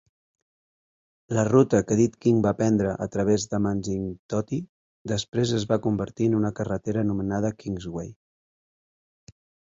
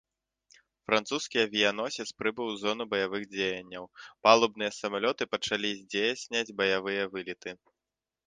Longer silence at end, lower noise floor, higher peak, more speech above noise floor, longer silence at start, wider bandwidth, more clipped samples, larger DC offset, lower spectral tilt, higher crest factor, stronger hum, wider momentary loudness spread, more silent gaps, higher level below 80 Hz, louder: first, 1.6 s vs 0.7 s; about the same, under -90 dBFS vs -90 dBFS; about the same, -6 dBFS vs -4 dBFS; first, over 66 dB vs 60 dB; first, 1.3 s vs 0.9 s; second, 7.8 kHz vs 9.8 kHz; neither; neither; first, -6.5 dB/octave vs -3 dB/octave; second, 20 dB vs 26 dB; neither; second, 11 LU vs 14 LU; first, 4.19-4.29 s, 4.69-5.05 s, 5.28-5.32 s vs none; first, -52 dBFS vs -72 dBFS; first, -25 LUFS vs -29 LUFS